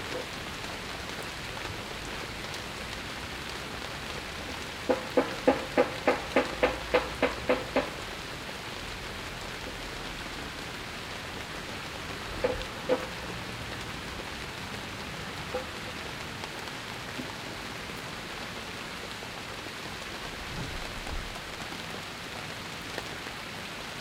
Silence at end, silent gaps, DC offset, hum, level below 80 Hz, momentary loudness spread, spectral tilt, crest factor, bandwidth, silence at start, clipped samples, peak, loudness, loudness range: 0 s; none; under 0.1%; none; -50 dBFS; 9 LU; -4 dB/octave; 26 dB; 16 kHz; 0 s; under 0.1%; -8 dBFS; -34 LUFS; 8 LU